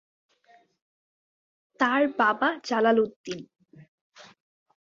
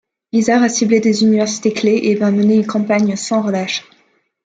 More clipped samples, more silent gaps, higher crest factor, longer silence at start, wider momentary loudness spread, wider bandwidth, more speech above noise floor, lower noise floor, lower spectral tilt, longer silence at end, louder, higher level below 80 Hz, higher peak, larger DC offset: neither; first, 3.16-3.24 s, 3.88-4.10 s vs none; first, 20 dB vs 14 dB; first, 1.8 s vs 0.35 s; first, 16 LU vs 6 LU; second, 7.6 kHz vs 9.2 kHz; second, 37 dB vs 44 dB; about the same, -61 dBFS vs -58 dBFS; about the same, -4.5 dB/octave vs -5 dB/octave; about the same, 0.65 s vs 0.65 s; second, -24 LUFS vs -15 LUFS; second, -74 dBFS vs -62 dBFS; second, -8 dBFS vs -2 dBFS; neither